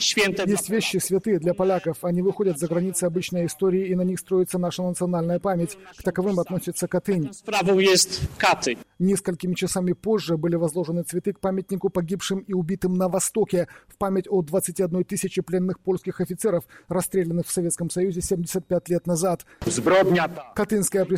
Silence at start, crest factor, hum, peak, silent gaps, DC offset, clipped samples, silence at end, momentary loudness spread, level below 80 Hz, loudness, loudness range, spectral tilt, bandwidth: 0 s; 16 dB; none; -8 dBFS; none; under 0.1%; under 0.1%; 0 s; 6 LU; -52 dBFS; -24 LUFS; 3 LU; -4.5 dB/octave; 16 kHz